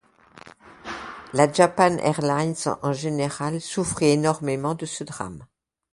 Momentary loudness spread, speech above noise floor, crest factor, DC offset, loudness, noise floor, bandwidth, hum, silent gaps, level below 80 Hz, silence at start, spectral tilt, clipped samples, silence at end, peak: 17 LU; 26 dB; 22 dB; under 0.1%; -23 LUFS; -49 dBFS; 11.5 kHz; none; none; -56 dBFS; 0.35 s; -5 dB/octave; under 0.1%; 0.5 s; -2 dBFS